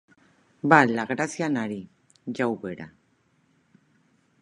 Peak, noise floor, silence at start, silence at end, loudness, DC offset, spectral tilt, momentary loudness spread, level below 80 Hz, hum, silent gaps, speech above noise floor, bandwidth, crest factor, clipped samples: 0 dBFS; -66 dBFS; 0.65 s; 1.55 s; -24 LUFS; under 0.1%; -5.5 dB/octave; 21 LU; -70 dBFS; none; none; 42 dB; 11.5 kHz; 26 dB; under 0.1%